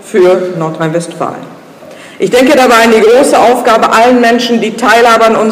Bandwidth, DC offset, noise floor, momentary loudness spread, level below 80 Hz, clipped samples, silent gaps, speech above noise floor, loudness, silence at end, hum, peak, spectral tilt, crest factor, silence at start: 16 kHz; under 0.1%; -31 dBFS; 11 LU; -46 dBFS; 0.7%; none; 24 dB; -7 LUFS; 0 s; none; 0 dBFS; -4 dB/octave; 8 dB; 0.05 s